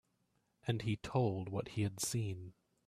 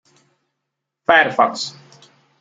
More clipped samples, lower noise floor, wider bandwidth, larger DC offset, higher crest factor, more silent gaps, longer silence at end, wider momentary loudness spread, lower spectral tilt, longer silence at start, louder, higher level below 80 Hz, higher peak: neither; about the same, -79 dBFS vs -79 dBFS; first, 14.5 kHz vs 9.2 kHz; neither; about the same, 20 dB vs 20 dB; neither; second, 0.35 s vs 0.7 s; second, 10 LU vs 14 LU; first, -5.5 dB/octave vs -3 dB/octave; second, 0.65 s vs 1.1 s; second, -39 LUFS vs -17 LUFS; about the same, -66 dBFS vs -64 dBFS; second, -20 dBFS vs -2 dBFS